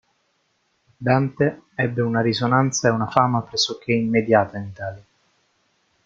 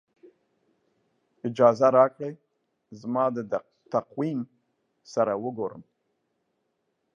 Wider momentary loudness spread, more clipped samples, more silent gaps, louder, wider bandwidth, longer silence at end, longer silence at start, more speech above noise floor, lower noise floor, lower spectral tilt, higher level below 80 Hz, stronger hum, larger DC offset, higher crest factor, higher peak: second, 10 LU vs 17 LU; neither; neither; first, -21 LUFS vs -26 LUFS; about the same, 7.6 kHz vs 7.4 kHz; second, 1.05 s vs 1.35 s; second, 1 s vs 1.45 s; second, 48 dB vs 52 dB; second, -68 dBFS vs -77 dBFS; second, -5 dB/octave vs -7.5 dB/octave; first, -58 dBFS vs -76 dBFS; neither; neither; about the same, 22 dB vs 22 dB; first, 0 dBFS vs -6 dBFS